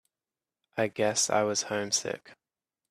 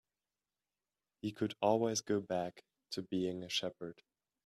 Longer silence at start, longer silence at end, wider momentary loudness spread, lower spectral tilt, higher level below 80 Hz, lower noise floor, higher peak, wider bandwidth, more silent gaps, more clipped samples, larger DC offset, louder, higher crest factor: second, 0.75 s vs 1.25 s; about the same, 0.6 s vs 0.5 s; about the same, 13 LU vs 12 LU; second, -2 dB/octave vs -4.5 dB/octave; about the same, -74 dBFS vs -78 dBFS; about the same, under -90 dBFS vs under -90 dBFS; first, -10 dBFS vs -18 dBFS; about the same, 14.5 kHz vs 14 kHz; neither; neither; neither; first, -28 LUFS vs -37 LUFS; about the same, 20 dB vs 22 dB